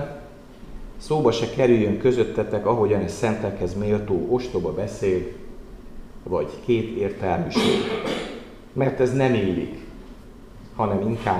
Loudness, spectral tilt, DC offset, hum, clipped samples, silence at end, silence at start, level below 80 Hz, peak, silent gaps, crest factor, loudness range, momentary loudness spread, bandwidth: -23 LUFS; -6.5 dB/octave; 0.1%; none; under 0.1%; 0 s; 0 s; -44 dBFS; -6 dBFS; none; 18 dB; 4 LU; 20 LU; 13 kHz